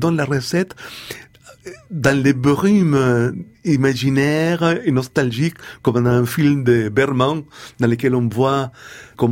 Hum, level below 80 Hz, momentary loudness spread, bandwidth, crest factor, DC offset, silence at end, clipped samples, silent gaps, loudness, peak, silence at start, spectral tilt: none; -50 dBFS; 16 LU; 17 kHz; 16 dB; under 0.1%; 0 s; under 0.1%; none; -17 LUFS; -2 dBFS; 0 s; -6.5 dB/octave